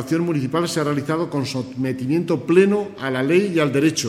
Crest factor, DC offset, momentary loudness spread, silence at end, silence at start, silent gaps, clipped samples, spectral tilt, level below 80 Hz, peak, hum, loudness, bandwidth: 18 dB; under 0.1%; 9 LU; 0 s; 0 s; none; under 0.1%; -5.5 dB/octave; -60 dBFS; -2 dBFS; none; -20 LUFS; 15.5 kHz